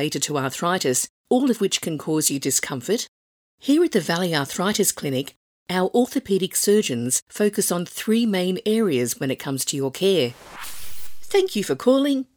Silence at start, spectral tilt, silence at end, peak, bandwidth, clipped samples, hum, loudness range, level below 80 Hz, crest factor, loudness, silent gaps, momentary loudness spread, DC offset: 0 s; -3.5 dB/octave; 0.15 s; -4 dBFS; over 20 kHz; under 0.1%; none; 2 LU; -64 dBFS; 18 dB; -22 LUFS; 1.09-1.24 s, 3.08-3.58 s, 5.36-5.66 s, 7.22-7.27 s; 8 LU; under 0.1%